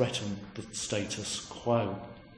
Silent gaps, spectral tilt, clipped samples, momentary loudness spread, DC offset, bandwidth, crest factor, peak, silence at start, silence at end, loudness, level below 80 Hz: none; -4 dB/octave; under 0.1%; 10 LU; under 0.1%; 10.5 kHz; 22 dB; -12 dBFS; 0 s; 0 s; -34 LUFS; -60 dBFS